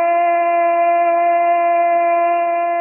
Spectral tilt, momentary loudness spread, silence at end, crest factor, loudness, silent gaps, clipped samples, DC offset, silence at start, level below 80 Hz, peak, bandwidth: -5.5 dB/octave; 2 LU; 0 s; 6 dB; -15 LUFS; none; under 0.1%; under 0.1%; 0 s; under -90 dBFS; -8 dBFS; 3 kHz